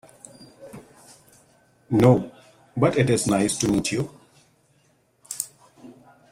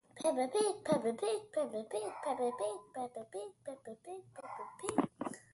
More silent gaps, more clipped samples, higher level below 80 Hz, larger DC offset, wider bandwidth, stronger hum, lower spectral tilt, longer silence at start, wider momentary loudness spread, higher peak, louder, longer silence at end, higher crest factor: neither; neither; first, -54 dBFS vs -78 dBFS; neither; first, 16 kHz vs 11.5 kHz; neither; about the same, -5.5 dB/octave vs -4.5 dB/octave; first, 0.4 s vs 0.15 s; first, 26 LU vs 15 LU; first, -4 dBFS vs -16 dBFS; first, -22 LUFS vs -38 LUFS; first, 0.4 s vs 0.15 s; about the same, 22 dB vs 24 dB